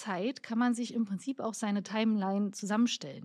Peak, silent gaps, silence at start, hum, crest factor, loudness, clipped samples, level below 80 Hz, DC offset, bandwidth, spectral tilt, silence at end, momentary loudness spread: -18 dBFS; none; 0 s; none; 14 dB; -32 LUFS; under 0.1%; -90 dBFS; under 0.1%; 12.5 kHz; -5 dB/octave; 0 s; 5 LU